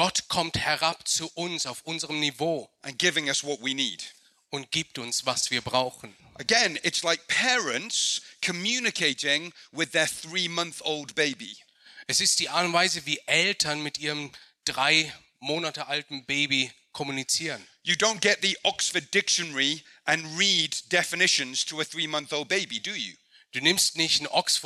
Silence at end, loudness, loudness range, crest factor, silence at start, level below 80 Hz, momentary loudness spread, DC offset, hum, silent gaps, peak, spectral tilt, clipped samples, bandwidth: 0 s; -25 LUFS; 4 LU; 22 dB; 0 s; -66 dBFS; 11 LU; under 0.1%; none; none; -6 dBFS; -1.5 dB/octave; under 0.1%; 15.5 kHz